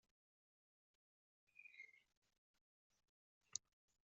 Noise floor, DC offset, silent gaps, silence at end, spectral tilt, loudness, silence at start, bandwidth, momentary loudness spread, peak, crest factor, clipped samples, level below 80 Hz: under -90 dBFS; under 0.1%; 2.17-2.22 s, 2.38-2.54 s, 2.61-2.90 s, 3.09-3.41 s; 0.5 s; 2.5 dB/octave; -56 LUFS; 1.55 s; 7.2 kHz; 12 LU; -26 dBFS; 40 dB; under 0.1%; under -90 dBFS